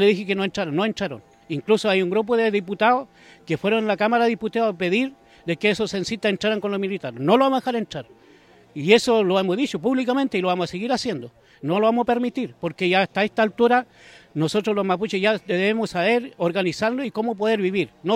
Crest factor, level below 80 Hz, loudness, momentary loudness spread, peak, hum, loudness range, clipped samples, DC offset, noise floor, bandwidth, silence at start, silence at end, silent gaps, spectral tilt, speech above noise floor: 20 dB; -62 dBFS; -22 LUFS; 10 LU; -2 dBFS; none; 2 LU; under 0.1%; under 0.1%; -52 dBFS; 13.5 kHz; 0 s; 0 s; none; -5.5 dB/octave; 30 dB